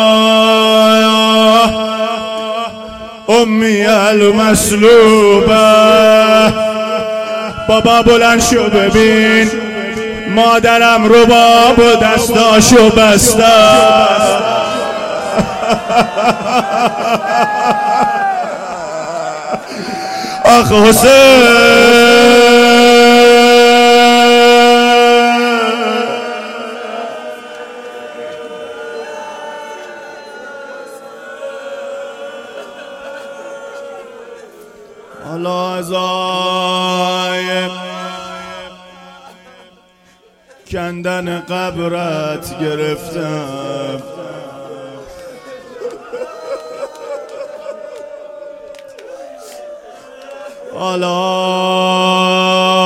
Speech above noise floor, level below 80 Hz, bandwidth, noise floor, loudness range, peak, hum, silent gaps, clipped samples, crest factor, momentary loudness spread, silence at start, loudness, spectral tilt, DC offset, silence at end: 40 dB; -38 dBFS; 16.5 kHz; -48 dBFS; 22 LU; 0 dBFS; none; none; under 0.1%; 12 dB; 23 LU; 0 s; -9 LUFS; -3.5 dB/octave; under 0.1%; 0 s